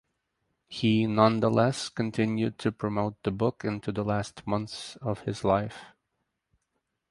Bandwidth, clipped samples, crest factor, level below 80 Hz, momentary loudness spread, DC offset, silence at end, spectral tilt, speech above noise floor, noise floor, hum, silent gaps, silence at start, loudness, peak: 11.5 kHz; under 0.1%; 24 dB; -58 dBFS; 11 LU; under 0.1%; 1.2 s; -6.5 dB/octave; 53 dB; -80 dBFS; none; none; 0.7 s; -28 LUFS; -4 dBFS